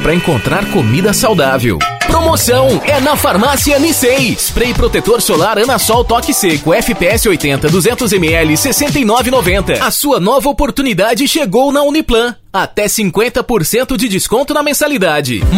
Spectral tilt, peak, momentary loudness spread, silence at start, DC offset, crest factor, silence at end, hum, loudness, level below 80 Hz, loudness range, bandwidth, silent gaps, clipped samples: -4 dB/octave; 0 dBFS; 3 LU; 0 s; under 0.1%; 10 dB; 0 s; none; -11 LUFS; -26 dBFS; 2 LU; 16.5 kHz; none; under 0.1%